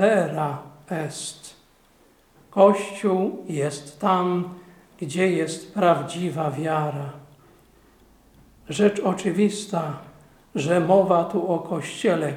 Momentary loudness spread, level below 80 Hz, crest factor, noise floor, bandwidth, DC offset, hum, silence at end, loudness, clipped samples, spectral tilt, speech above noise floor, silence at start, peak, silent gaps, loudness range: 15 LU; -62 dBFS; 22 dB; -57 dBFS; 15.5 kHz; under 0.1%; none; 0 s; -23 LUFS; under 0.1%; -6 dB/octave; 35 dB; 0 s; -2 dBFS; none; 4 LU